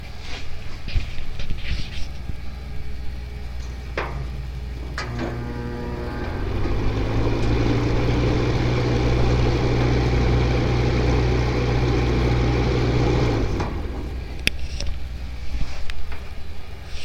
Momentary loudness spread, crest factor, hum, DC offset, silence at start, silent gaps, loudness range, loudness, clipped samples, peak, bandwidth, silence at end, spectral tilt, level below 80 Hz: 14 LU; 22 dB; none; 0.8%; 0 s; none; 11 LU; -24 LUFS; under 0.1%; 0 dBFS; 12 kHz; 0 s; -6.5 dB/octave; -26 dBFS